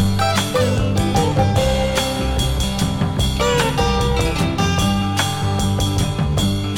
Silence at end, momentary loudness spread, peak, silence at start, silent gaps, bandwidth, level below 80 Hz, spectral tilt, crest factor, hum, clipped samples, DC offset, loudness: 0 s; 3 LU; -4 dBFS; 0 s; none; 17 kHz; -26 dBFS; -5 dB/octave; 14 dB; none; under 0.1%; under 0.1%; -18 LUFS